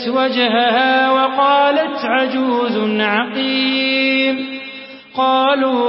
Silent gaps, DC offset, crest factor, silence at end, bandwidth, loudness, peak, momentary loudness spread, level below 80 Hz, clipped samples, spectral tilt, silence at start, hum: none; under 0.1%; 14 dB; 0 s; 5.8 kHz; -15 LUFS; -2 dBFS; 8 LU; -66 dBFS; under 0.1%; -9 dB/octave; 0 s; none